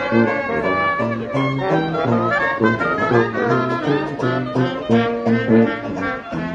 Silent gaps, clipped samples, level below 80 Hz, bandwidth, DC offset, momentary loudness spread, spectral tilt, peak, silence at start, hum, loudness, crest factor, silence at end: none; under 0.1%; -50 dBFS; 7.6 kHz; under 0.1%; 5 LU; -7.5 dB/octave; -2 dBFS; 0 s; none; -18 LUFS; 18 dB; 0 s